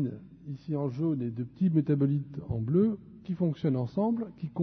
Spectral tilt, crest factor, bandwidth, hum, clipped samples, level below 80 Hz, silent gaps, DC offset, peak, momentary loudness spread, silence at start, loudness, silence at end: -11.5 dB/octave; 16 dB; 6 kHz; none; under 0.1%; -60 dBFS; none; under 0.1%; -14 dBFS; 12 LU; 0 s; -30 LUFS; 0 s